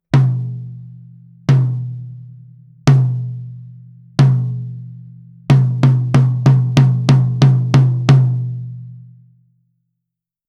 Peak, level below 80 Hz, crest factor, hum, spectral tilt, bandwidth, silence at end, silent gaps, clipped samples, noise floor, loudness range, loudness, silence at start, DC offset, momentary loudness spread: 0 dBFS; -48 dBFS; 16 dB; none; -8 dB/octave; 7.2 kHz; 1.5 s; none; under 0.1%; -81 dBFS; 6 LU; -14 LUFS; 0.15 s; under 0.1%; 21 LU